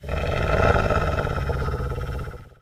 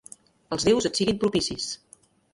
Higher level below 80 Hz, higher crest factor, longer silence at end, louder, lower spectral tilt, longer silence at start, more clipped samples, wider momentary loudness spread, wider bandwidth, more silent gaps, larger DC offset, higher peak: first, -30 dBFS vs -52 dBFS; about the same, 18 dB vs 18 dB; second, 0.15 s vs 0.6 s; about the same, -24 LUFS vs -25 LUFS; first, -7 dB/octave vs -4 dB/octave; second, 0 s vs 0.5 s; neither; about the same, 12 LU vs 11 LU; first, 15.5 kHz vs 11.5 kHz; neither; neither; first, -6 dBFS vs -10 dBFS